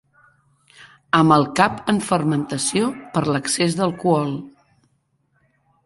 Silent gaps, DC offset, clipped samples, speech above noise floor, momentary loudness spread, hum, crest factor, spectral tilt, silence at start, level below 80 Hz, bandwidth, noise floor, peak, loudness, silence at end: none; under 0.1%; under 0.1%; 47 dB; 7 LU; none; 20 dB; -5 dB/octave; 0.8 s; -56 dBFS; 11.5 kHz; -66 dBFS; -2 dBFS; -19 LUFS; 1.35 s